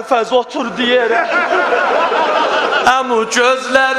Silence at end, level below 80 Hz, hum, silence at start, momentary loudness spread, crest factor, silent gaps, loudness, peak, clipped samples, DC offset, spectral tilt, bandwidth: 0 s; -54 dBFS; none; 0 s; 3 LU; 14 dB; none; -13 LUFS; 0 dBFS; under 0.1%; under 0.1%; -2 dB/octave; 13.5 kHz